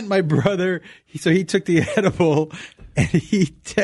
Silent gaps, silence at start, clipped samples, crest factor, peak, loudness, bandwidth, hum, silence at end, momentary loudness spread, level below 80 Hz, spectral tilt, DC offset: none; 0 s; under 0.1%; 14 dB; -4 dBFS; -20 LUFS; 12 kHz; none; 0 s; 10 LU; -46 dBFS; -6 dB/octave; under 0.1%